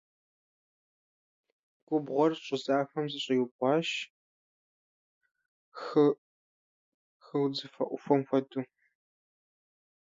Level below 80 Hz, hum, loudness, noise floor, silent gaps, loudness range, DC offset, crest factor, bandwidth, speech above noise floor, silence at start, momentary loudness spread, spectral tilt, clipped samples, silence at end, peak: -86 dBFS; none; -31 LUFS; under -90 dBFS; 3.51-3.59 s, 4.10-5.21 s, 5.48-5.72 s, 6.18-7.20 s; 3 LU; under 0.1%; 22 dB; 7.8 kHz; over 61 dB; 1.9 s; 13 LU; -6 dB/octave; under 0.1%; 1.5 s; -10 dBFS